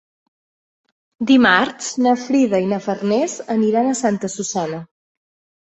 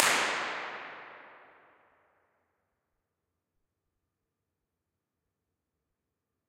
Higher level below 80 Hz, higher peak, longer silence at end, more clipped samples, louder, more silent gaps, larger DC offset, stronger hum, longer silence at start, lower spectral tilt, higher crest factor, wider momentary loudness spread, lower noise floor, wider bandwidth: first, -62 dBFS vs -82 dBFS; about the same, -2 dBFS vs -2 dBFS; second, 0.8 s vs 5.1 s; neither; first, -18 LUFS vs -31 LUFS; neither; neither; neither; first, 1.2 s vs 0 s; first, -4 dB/octave vs 0 dB/octave; second, 18 dB vs 38 dB; second, 10 LU vs 24 LU; first, under -90 dBFS vs -86 dBFS; second, 8.2 kHz vs 14.5 kHz